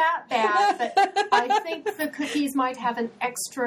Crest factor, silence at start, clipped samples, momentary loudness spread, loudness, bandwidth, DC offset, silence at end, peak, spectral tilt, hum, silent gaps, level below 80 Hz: 18 dB; 0 s; under 0.1%; 8 LU; -24 LUFS; 17.5 kHz; under 0.1%; 0 s; -6 dBFS; -2 dB/octave; none; none; -76 dBFS